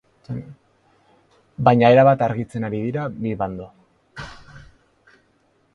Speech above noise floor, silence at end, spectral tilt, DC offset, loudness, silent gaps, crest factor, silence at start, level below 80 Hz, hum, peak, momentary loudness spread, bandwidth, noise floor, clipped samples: 44 dB; 1.15 s; -8.5 dB/octave; under 0.1%; -18 LUFS; none; 22 dB; 0.3 s; -52 dBFS; none; 0 dBFS; 25 LU; 11 kHz; -62 dBFS; under 0.1%